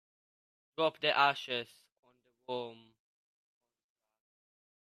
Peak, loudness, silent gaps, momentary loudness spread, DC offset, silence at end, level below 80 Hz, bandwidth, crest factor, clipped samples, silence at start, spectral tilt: -14 dBFS; -33 LUFS; 1.92-2.03 s; 20 LU; under 0.1%; 2.15 s; -88 dBFS; 13.5 kHz; 24 dB; under 0.1%; 0.8 s; -4 dB/octave